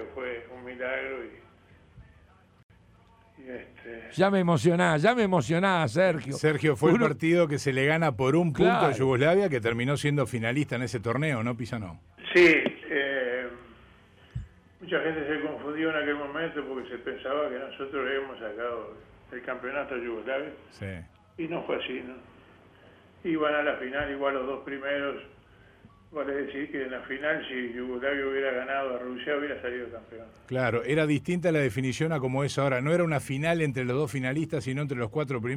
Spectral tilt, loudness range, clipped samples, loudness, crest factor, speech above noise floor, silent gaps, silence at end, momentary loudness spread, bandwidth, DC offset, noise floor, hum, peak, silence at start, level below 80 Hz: -6 dB/octave; 11 LU; under 0.1%; -28 LUFS; 18 dB; 30 dB; 2.63-2.69 s; 0 s; 17 LU; 15 kHz; under 0.1%; -58 dBFS; none; -10 dBFS; 0 s; -58 dBFS